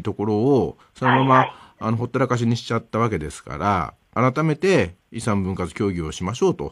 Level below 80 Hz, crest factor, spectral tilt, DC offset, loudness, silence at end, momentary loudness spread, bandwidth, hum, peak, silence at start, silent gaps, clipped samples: -46 dBFS; 18 dB; -6.5 dB/octave; under 0.1%; -22 LUFS; 0 s; 10 LU; 12 kHz; none; -2 dBFS; 0 s; none; under 0.1%